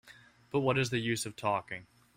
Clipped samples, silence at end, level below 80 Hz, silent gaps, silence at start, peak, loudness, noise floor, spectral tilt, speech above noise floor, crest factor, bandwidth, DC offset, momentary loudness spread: under 0.1%; 0.3 s; -66 dBFS; none; 0.05 s; -14 dBFS; -32 LUFS; -58 dBFS; -5 dB/octave; 26 dB; 20 dB; 16 kHz; under 0.1%; 11 LU